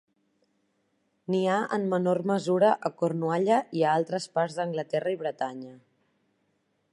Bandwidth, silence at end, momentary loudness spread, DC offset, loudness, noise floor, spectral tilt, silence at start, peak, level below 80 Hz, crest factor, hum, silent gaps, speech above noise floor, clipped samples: 11 kHz; 1.15 s; 9 LU; under 0.1%; -27 LUFS; -73 dBFS; -6.5 dB/octave; 1.3 s; -10 dBFS; -80 dBFS; 18 dB; none; none; 47 dB; under 0.1%